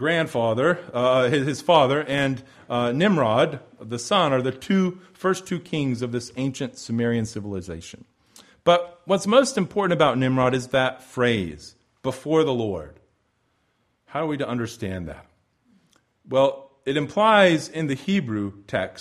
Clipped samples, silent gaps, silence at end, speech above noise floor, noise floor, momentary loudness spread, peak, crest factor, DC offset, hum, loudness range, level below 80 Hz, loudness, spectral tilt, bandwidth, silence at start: under 0.1%; none; 0 s; 47 dB; -69 dBFS; 13 LU; -4 dBFS; 20 dB; under 0.1%; none; 7 LU; -56 dBFS; -23 LUFS; -5.5 dB/octave; 13 kHz; 0 s